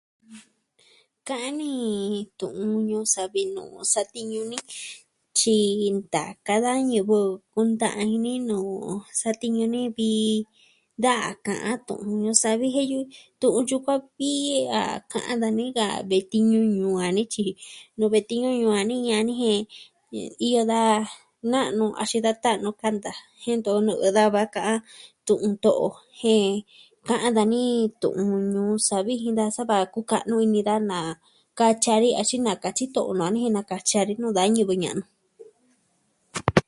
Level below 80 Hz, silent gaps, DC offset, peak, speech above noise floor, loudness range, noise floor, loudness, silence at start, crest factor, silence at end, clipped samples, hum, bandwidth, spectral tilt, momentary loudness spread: -60 dBFS; none; under 0.1%; 0 dBFS; 45 dB; 3 LU; -68 dBFS; -24 LUFS; 0.3 s; 24 dB; 0.05 s; under 0.1%; none; 11.5 kHz; -4 dB/octave; 11 LU